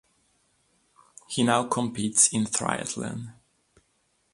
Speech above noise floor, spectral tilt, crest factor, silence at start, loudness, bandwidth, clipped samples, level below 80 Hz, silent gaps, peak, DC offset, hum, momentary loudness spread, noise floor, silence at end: 45 dB; -3 dB/octave; 24 dB; 1.3 s; -24 LUFS; 11.5 kHz; under 0.1%; -64 dBFS; none; -6 dBFS; under 0.1%; none; 15 LU; -71 dBFS; 1 s